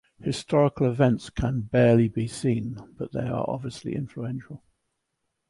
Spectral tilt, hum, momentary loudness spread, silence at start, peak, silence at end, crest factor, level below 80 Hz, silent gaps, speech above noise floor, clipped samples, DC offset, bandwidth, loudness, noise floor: -7.5 dB/octave; none; 15 LU; 0.2 s; -8 dBFS; 0.95 s; 18 dB; -48 dBFS; none; 54 dB; under 0.1%; under 0.1%; 11.5 kHz; -25 LUFS; -79 dBFS